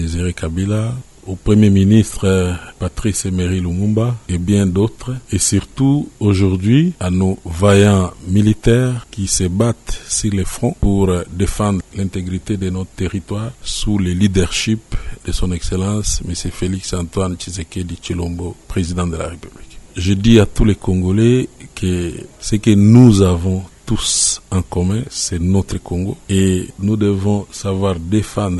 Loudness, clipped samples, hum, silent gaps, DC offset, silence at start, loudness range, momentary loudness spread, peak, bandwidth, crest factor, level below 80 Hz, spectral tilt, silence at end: -16 LUFS; under 0.1%; none; none; under 0.1%; 0 s; 7 LU; 12 LU; 0 dBFS; 12 kHz; 16 dB; -30 dBFS; -5.5 dB/octave; 0 s